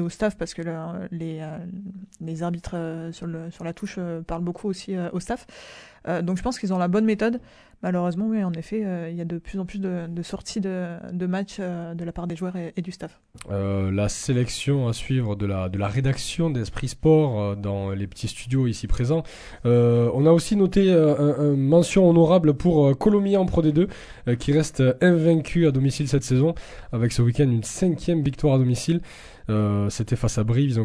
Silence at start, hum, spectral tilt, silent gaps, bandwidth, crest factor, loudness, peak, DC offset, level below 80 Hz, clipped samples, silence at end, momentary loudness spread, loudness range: 0 s; none; -7 dB/octave; none; 11 kHz; 18 dB; -23 LUFS; -4 dBFS; under 0.1%; -42 dBFS; under 0.1%; 0 s; 14 LU; 12 LU